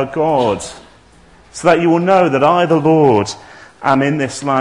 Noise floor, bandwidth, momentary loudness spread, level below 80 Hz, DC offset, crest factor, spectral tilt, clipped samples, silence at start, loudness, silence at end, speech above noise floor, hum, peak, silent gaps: -45 dBFS; 11 kHz; 12 LU; -50 dBFS; 0.2%; 14 dB; -6 dB/octave; under 0.1%; 0 s; -14 LUFS; 0 s; 32 dB; none; 0 dBFS; none